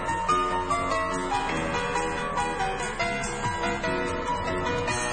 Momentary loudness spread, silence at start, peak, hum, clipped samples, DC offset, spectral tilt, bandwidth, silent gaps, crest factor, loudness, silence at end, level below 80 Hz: 3 LU; 0 s; -14 dBFS; none; under 0.1%; under 0.1%; -4 dB/octave; 9.4 kHz; none; 14 dB; -27 LUFS; 0 s; -42 dBFS